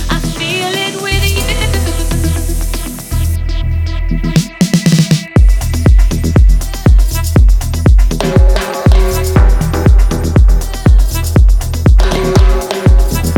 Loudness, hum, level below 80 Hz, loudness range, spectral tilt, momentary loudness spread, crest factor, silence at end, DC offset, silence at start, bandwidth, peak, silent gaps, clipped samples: -12 LUFS; none; -10 dBFS; 4 LU; -5.5 dB/octave; 6 LU; 10 dB; 0 s; under 0.1%; 0 s; 17.5 kHz; 0 dBFS; none; under 0.1%